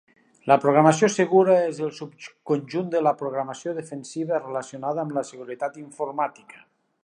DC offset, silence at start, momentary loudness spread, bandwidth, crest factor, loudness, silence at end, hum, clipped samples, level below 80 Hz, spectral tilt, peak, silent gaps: under 0.1%; 0.45 s; 15 LU; 10.5 kHz; 22 dB; -23 LUFS; 0.75 s; none; under 0.1%; -76 dBFS; -6 dB/octave; -2 dBFS; none